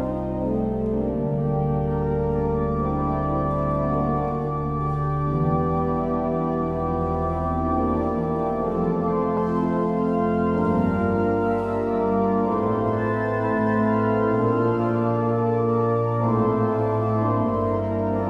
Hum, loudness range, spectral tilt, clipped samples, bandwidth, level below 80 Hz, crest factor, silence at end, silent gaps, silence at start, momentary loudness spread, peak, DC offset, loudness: none; 2 LU; -10.5 dB/octave; under 0.1%; 6 kHz; -38 dBFS; 14 dB; 0 s; none; 0 s; 3 LU; -10 dBFS; under 0.1%; -23 LUFS